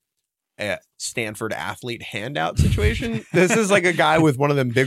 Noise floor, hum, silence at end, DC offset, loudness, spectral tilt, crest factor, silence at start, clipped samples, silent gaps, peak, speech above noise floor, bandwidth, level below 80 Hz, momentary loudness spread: -80 dBFS; none; 0 s; under 0.1%; -21 LUFS; -5 dB/octave; 16 dB; 0.6 s; under 0.1%; none; -4 dBFS; 60 dB; 15 kHz; -34 dBFS; 12 LU